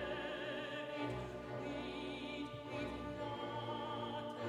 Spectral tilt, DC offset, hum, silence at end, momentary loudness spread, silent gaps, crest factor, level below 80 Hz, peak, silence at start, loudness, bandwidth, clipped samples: -6 dB/octave; under 0.1%; none; 0 s; 3 LU; none; 14 dB; -62 dBFS; -30 dBFS; 0 s; -44 LUFS; 15 kHz; under 0.1%